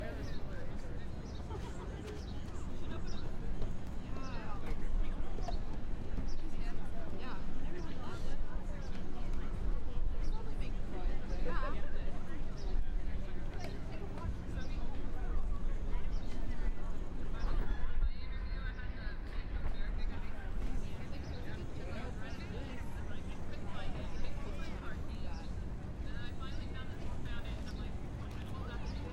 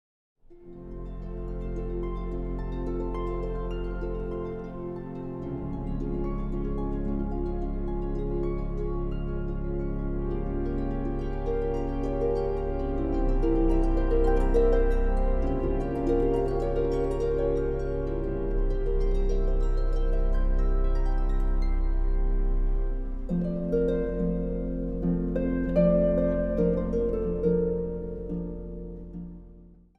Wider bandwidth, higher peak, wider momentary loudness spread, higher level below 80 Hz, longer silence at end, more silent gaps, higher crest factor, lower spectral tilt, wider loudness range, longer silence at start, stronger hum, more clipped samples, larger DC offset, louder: first, 6.6 kHz vs 4.2 kHz; second, -20 dBFS vs -10 dBFS; second, 4 LU vs 10 LU; second, -38 dBFS vs -28 dBFS; second, 0 s vs 0.25 s; neither; about the same, 14 dB vs 16 dB; second, -6.5 dB/octave vs -10 dB/octave; second, 2 LU vs 7 LU; second, 0 s vs 0.5 s; neither; neither; neither; second, -44 LUFS vs -29 LUFS